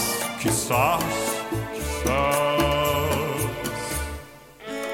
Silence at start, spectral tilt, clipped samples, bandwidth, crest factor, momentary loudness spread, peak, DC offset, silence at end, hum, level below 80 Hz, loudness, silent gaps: 0 s; -4 dB/octave; under 0.1%; 17 kHz; 18 dB; 10 LU; -8 dBFS; under 0.1%; 0 s; none; -38 dBFS; -24 LUFS; none